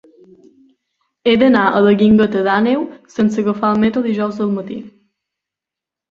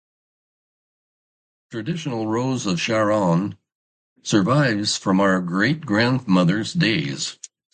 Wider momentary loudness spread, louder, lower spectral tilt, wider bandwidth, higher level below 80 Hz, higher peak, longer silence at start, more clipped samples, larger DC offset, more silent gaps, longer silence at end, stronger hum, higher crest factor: about the same, 10 LU vs 10 LU; first, -15 LUFS vs -21 LUFS; first, -7.5 dB/octave vs -5 dB/octave; second, 7 kHz vs 9.4 kHz; first, -52 dBFS vs -58 dBFS; about the same, -2 dBFS vs -4 dBFS; second, 1.25 s vs 1.7 s; neither; neither; second, none vs 3.75-4.16 s; first, 1.2 s vs 0.4 s; neither; about the same, 16 dB vs 18 dB